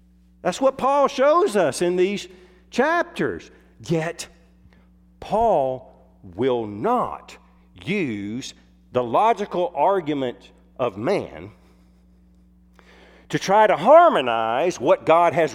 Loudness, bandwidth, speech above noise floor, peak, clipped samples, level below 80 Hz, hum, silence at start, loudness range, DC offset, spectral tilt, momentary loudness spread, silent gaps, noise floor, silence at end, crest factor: -21 LUFS; 14 kHz; 33 dB; -2 dBFS; under 0.1%; -54 dBFS; none; 0.45 s; 7 LU; under 0.1%; -5 dB/octave; 18 LU; none; -54 dBFS; 0 s; 20 dB